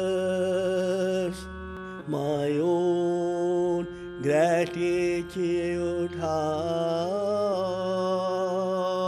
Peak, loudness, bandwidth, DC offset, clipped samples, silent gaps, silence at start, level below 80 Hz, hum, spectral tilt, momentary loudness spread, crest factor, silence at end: -12 dBFS; -27 LUFS; 12 kHz; under 0.1%; under 0.1%; none; 0 s; -54 dBFS; none; -6.5 dB/octave; 7 LU; 14 dB; 0 s